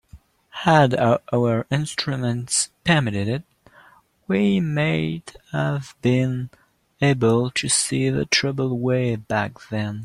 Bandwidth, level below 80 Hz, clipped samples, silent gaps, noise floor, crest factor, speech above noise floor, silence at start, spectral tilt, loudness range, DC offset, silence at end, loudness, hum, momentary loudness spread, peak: 12.5 kHz; -54 dBFS; under 0.1%; none; -53 dBFS; 20 dB; 32 dB; 0.15 s; -4.5 dB/octave; 3 LU; under 0.1%; 0 s; -21 LUFS; none; 10 LU; -2 dBFS